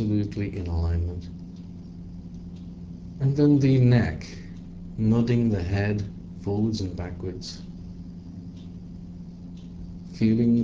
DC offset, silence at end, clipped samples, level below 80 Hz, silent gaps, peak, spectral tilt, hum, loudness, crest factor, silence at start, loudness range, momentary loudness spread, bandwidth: under 0.1%; 0 s; under 0.1%; -38 dBFS; none; -8 dBFS; -8.5 dB/octave; none; -25 LUFS; 18 dB; 0 s; 10 LU; 21 LU; 7.6 kHz